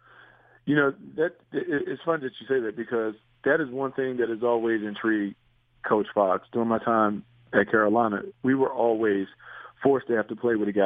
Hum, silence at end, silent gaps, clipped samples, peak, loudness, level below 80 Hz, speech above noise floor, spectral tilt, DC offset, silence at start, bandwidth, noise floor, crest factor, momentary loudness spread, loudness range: none; 0 s; none; under 0.1%; -4 dBFS; -26 LUFS; -68 dBFS; 30 dB; -9 dB/octave; under 0.1%; 0.65 s; 3.9 kHz; -55 dBFS; 20 dB; 7 LU; 4 LU